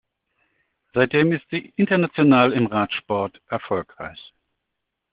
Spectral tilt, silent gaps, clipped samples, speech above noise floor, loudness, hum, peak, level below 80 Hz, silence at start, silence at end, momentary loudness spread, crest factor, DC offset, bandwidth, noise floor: -5 dB/octave; none; under 0.1%; 60 dB; -21 LUFS; none; -2 dBFS; -60 dBFS; 0.95 s; 1 s; 13 LU; 22 dB; under 0.1%; 5 kHz; -80 dBFS